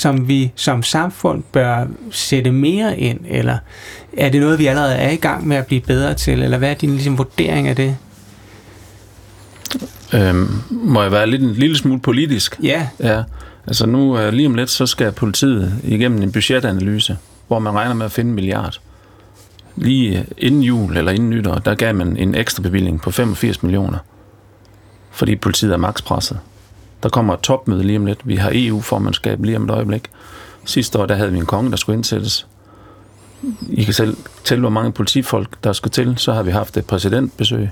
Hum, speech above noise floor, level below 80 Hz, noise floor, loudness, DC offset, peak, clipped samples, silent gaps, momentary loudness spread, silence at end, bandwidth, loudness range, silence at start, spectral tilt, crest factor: none; 30 dB; -38 dBFS; -45 dBFS; -16 LUFS; under 0.1%; -2 dBFS; under 0.1%; none; 8 LU; 0 s; 19 kHz; 4 LU; 0 s; -5.5 dB/octave; 14 dB